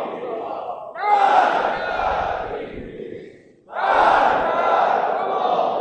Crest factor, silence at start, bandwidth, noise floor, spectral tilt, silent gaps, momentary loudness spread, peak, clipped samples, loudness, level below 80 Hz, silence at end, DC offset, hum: 16 dB; 0 s; 8.8 kHz; -44 dBFS; -4.5 dB/octave; none; 18 LU; -4 dBFS; under 0.1%; -19 LUFS; -48 dBFS; 0 s; under 0.1%; none